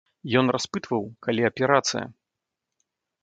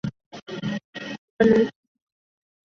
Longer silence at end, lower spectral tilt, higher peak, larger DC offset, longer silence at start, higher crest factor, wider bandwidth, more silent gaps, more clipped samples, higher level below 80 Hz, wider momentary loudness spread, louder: about the same, 1.1 s vs 1 s; second, -4.5 dB/octave vs -7 dB/octave; about the same, -4 dBFS vs -6 dBFS; neither; first, 0.25 s vs 0.05 s; about the same, 22 dB vs 20 dB; first, 9 kHz vs 7.2 kHz; second, none vs 0.26-0.31 s, 0.42-0.46 s, 0.84-0.93 s, 1.18-1.37 s; neither; second, -64 dBFS vs -58 dBFS; second, 8 LU vs 18 LU; about the same, -24 LUFS vs -23 LUFS